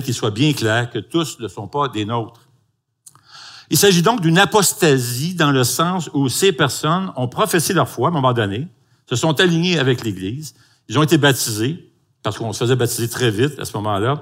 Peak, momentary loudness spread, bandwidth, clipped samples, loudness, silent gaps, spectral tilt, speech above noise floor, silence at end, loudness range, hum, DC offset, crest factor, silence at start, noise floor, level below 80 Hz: 0 dBFS; 12 LU; 16 kHz; under 0.1%; -17 LUFS; none; -4.5 dB/octave; 48 dB; 0 s; 4 LU; none; under 0.1%; 18 dB; 0 s; -66 dBFS; -60 dBFS